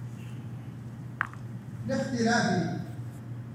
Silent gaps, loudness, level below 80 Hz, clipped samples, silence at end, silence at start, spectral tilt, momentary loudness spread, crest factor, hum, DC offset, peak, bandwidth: none; -32 LUFS; -62 dBFS; under 0.1%; 0 s; 0 s; -5.5 dB/octave; 15 LU; 24 dB; none; under 0.1%; -8 dBFS; 15.5 kHz